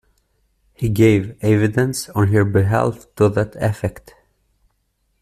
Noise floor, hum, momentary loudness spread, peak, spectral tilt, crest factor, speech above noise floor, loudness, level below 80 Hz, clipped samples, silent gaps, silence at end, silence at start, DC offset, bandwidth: -67 dBFS; none; 8 LU; -2 dBFS; -7 dB/octave; 16 dB; 50 dB; -18 LUFS; -46 dBFS; under 0.1%; none; 1.2 s; 0.8 s; under 0.1%; 14 kHz